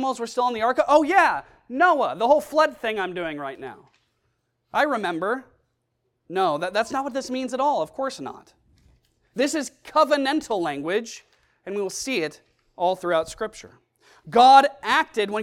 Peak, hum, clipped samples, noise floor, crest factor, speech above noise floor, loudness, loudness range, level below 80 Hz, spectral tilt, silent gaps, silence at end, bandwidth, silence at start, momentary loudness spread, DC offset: 0 dBFS; none; under 0.1%; -74 dBFS; 22 dB; 52 dB; -22 LUFS; 7 LU; -62 dBFS; -3.5 dB/octave; none; 0 s; 15.5 kHz; 0 s; 15 LU; under 0.1%